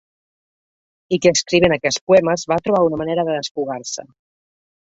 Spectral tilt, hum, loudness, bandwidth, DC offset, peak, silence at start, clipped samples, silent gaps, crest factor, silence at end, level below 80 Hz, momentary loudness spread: -4 dB/octave; none; -17 LUFS; 8 kHz; under 0.1%; 0 dBFS; 1.1 s; under 0.1%; 2.01-2.07 s, 3.51-3.55 s; 18 dB; 0.8 s; -52 dBFS; 10 LU